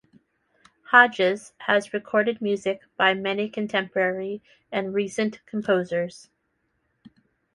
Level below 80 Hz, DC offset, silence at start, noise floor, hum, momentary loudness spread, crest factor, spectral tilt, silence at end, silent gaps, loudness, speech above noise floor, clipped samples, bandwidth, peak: -70 dBFS; under 0.1%; 0.9 s; -73 dBFS; none; 13 LU; 24 dB; -4.5 dB/octave; 1.35 s; none; -24 LUFS; 49 dB; under 0.1%; 11.5 kHz; -2 dBFS